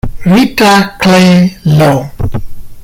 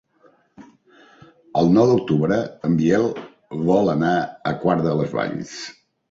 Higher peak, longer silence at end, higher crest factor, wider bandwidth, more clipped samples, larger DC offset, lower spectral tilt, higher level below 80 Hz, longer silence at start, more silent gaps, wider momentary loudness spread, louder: first, 0 dBFS vs -4 dBFS; second, 0 s vs 0.4 s; second, 8 dB vs 16 dB; first, 16.5 kHz vs 7.8 kHz; neither; neither; second, -6 dB/octave vs -7.5 dB/octave; first, -26 dBFS vs -54 dBFS; second, 0.05 s vs 0.6 s; neither; about the same, 13 LU vs 15 LU; first, -8 LUFS vs -20 LUFS